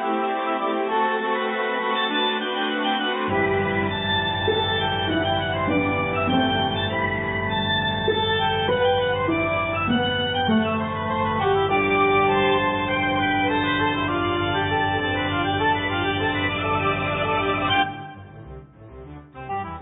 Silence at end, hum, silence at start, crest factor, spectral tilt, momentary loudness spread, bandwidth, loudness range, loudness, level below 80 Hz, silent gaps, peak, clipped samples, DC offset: 0 s; none; 0 s; 14 dB; -10 dB/octave; 4 LU; 4 kHz; 2 LU; -22 LUFS; -42 dBFS; none; -8 dBFS; under 0.1%; under 0.1%